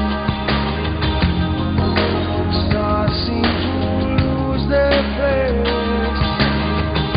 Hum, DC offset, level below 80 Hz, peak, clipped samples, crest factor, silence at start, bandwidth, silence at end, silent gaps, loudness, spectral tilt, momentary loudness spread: none; under 0.1%; -26 dBFS; -2 dBFS; under 0.1%; 16 dB; 0 s; 5.2 kHz; 0 s; none; -18 LUFS; -10.5 dB/octave; 3 LU